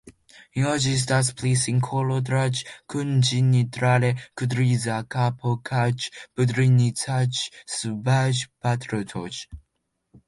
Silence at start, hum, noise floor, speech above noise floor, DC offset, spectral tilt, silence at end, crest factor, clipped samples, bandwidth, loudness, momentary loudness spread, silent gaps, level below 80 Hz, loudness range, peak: 0.05 s; none; -76 dBFS; 53 dB; under 0.1%; -5 dB/octave; 0.7 s; 16 dB; under 0.1%; 11.5 kHz; -23 LUFS; 10 LU; none; -56 dBFS; 2 LU; -8 dBFS